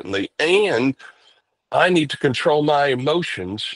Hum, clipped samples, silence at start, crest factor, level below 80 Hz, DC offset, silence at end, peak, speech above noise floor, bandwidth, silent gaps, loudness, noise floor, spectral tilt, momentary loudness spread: none; under 0.1%; 0.05 s; 18 dB; -62 dBFS; under 0.1%; 0 s; -2 dBFS; 39 dB; 11.5 kHz; none; -19 LUFS; -58 dBFS; -5 dB/octave; 9 LU